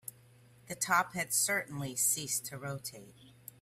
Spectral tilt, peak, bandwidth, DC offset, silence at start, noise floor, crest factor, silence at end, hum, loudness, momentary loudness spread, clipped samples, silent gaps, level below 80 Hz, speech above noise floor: -2 dB/octave; -14 dBFS; 16 kHz; under 0.1%; 0.05 s; -61 dBFS; 22 dB; 0.3 s; none; -32 LUFS; 20 LU; under 0.1%; none; -72 dBFS; 26 dB